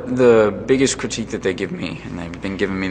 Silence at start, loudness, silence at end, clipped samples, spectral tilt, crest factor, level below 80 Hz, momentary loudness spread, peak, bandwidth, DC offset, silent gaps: 0 s; -19 LUFS; 0 s; under 0.1%; -5 dB/octave; 16 dB; -44 dBFS; 14 LU; -2 dBFS; 9.8 kHz; under 0.1%; none